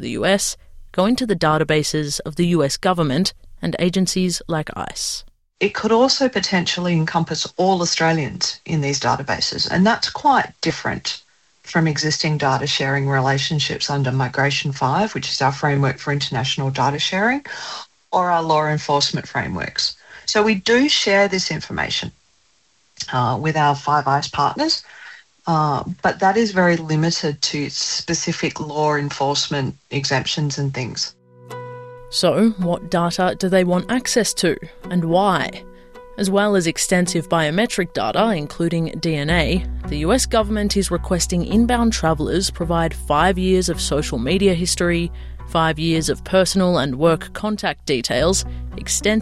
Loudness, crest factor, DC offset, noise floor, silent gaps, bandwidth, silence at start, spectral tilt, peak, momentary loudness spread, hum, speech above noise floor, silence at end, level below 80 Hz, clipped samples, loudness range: -19 LUFS; 16 dB; under 0.1%; -61 dBFS; none; 13 kHz; 0 s; -4.5 dB/octave; -4 dBFS; 8 LU; none; 42 dB; 0 s; -36 dBFS; under 0.1%; 2 LU